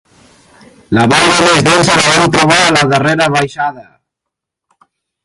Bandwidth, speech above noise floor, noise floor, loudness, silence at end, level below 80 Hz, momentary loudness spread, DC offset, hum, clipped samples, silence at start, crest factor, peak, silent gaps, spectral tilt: 16 kHz; 69 dB; -79 dBFS; -9 LUFS; 1.4 s; -42 dBFS; 8 LU; under 0.1%; none; under 0.1%; 0.9 s; 12 dB; 0 dBFS; none; -3.5 dB/octave